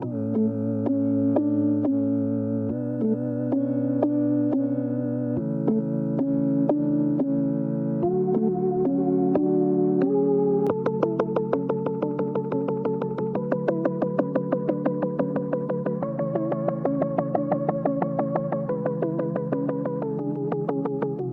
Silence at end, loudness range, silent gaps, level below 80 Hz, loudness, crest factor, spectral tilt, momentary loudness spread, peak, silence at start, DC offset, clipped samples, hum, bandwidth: 0 s; 3 LU; none; -64 dBFS; -25 LUFS; 16 dB; -12 dB/octave; 5 LU; -8 dBFS; 0 s; under 0.1%; under 0.1%; none; 3.9 kHz